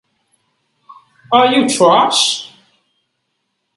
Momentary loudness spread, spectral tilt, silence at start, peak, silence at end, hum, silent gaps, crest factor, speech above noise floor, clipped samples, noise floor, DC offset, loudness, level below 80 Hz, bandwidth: 10 LU; -2.5 dB/octave; 1.3 s; 0 dBFS; 1.3 s; none; none; 16 dB; 59 dB; under 0.1%; -70 dBFS; under 0.1%; -12 LUFS; -64 dBFS; 11.5 kHz